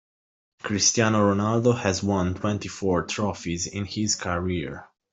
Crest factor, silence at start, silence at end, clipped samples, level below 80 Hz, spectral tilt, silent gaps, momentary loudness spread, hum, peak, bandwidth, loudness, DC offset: 18 dB; 0.65 s; 0.25 s; under 0.1%; -56 dBFS; -4 dB/octave; none; 9 LU; none; -6 dBFS; 8.2 kHz; -24 LUFS; under 0.1%